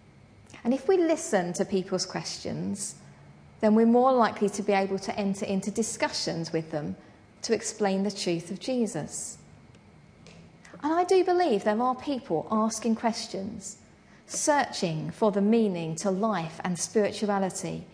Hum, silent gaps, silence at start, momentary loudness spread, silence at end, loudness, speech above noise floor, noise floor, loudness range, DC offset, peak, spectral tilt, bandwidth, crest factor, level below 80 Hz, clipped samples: none; none; 0.5 s; 12 LU; 0.05 s; -27 LUFS; 27 dB; -54 dBFS; 5 LU; under 0.1%; -10 dBFS; -4.5 dB/octave; 11 kHz; 18 dB; -64 dBFS; under 0.1%